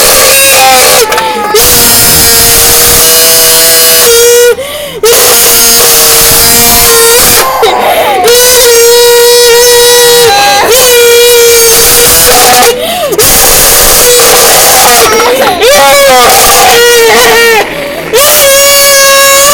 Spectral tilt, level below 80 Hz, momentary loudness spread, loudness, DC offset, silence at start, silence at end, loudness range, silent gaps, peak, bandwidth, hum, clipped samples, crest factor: -0.5 dB/octave; -26 dBFS; 5 LU; -1 LUFS; under 0.1%; 0 s; 0 s; 1 LU; none; 0 dBFS; over 20 kHz; none; 20%; 2 dB